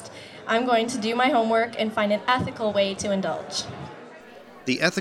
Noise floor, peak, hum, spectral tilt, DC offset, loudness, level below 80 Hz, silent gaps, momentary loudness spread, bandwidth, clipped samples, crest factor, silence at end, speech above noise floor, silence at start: -45 dBFS; -6 dBFS; none; -4 dB/octave; under 0.1%; -24 LUFS; -62 dBFS; none; 17 LU; 13.5 kHz; under 0.1%; 20 dB; 0 s; 22 dB; 0 s